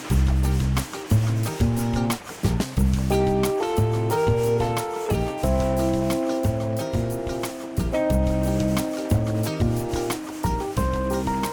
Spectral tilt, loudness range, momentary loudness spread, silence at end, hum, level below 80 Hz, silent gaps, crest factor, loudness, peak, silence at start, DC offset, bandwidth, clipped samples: -6.5 dB/octave; 2 LU; 5 LU; 0 s; none; -30 dBFS; none; 14 dB; -24 LUFS; -10 dBFS; 0 s; under 0.1%; over 20 kHz; under 0.1%